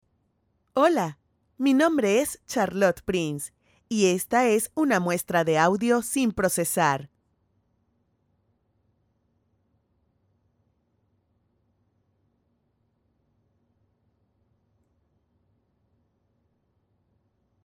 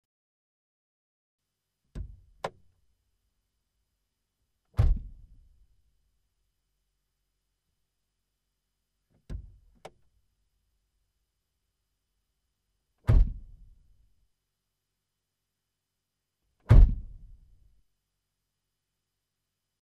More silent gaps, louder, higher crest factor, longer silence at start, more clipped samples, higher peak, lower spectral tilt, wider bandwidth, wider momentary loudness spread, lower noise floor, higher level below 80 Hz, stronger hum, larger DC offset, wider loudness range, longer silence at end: neither; first, -24 LUFS vs -27 LUFS; second, 22 dB vs 28 dB; second, 0.75 s vs 1.95 s; neither; about the same, -6 dBFS vs -6 dBFS; second, -4.5 dB/octave vs -8.5 dB/octave; first, over 20 kHz vs 5.4 kHz; second, 9 LU vs 24 LU; second, -72 dBFS vs -85 dBFS; second, -62 dBFS vs -34 dBFS; neither; neither; second, 6 LU vs 23 LU; first, 10.6 s vs 2.75 s